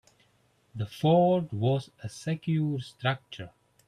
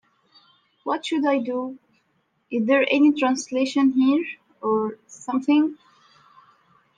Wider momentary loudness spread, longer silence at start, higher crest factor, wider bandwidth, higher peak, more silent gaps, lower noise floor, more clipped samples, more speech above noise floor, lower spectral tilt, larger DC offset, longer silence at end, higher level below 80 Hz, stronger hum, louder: first, 21 LU vs 12 LU; about the same, 0.75 s vs 0.85 s; about the same, 16 dB vs 16 dB; first, 13 kHz vs 9.4 kHz; second, -12 dBFS vs -8 dBFS; neither; about the same, -67 dBFS vs -69 dBFS; neither; second, 39 dB vs 48 dB; first, -7.5 dB/octave vs -4.5 dB/octave; neither; second, 0.4 s vs 1.25 s; first, -66 dBFS vs -76 dBFS; neither; second, -28 LUFS vs -22 LUFS